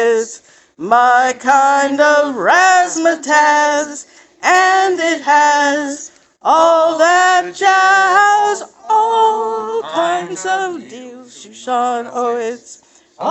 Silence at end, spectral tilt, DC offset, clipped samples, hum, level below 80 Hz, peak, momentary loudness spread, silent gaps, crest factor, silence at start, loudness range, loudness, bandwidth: 0 s; -1.5 dB/octave; under 0.1%; under 0.1%; none; -68 dBFS; 0 dBFS; 14 LU; none; 14 dB; 0 s; 8 LU; -13 LUFS; 9.2 kHz